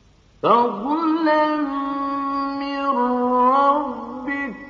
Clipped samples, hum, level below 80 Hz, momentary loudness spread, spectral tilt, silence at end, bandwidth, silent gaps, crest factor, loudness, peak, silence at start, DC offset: under 0.1%; none; -56 dBFS; 9 LU; -6.5 dB/octave; 0 s; 7 kHz; none; 18 dB; -20 LUFS; -2 dBFS; 0.45 s; under 0.1%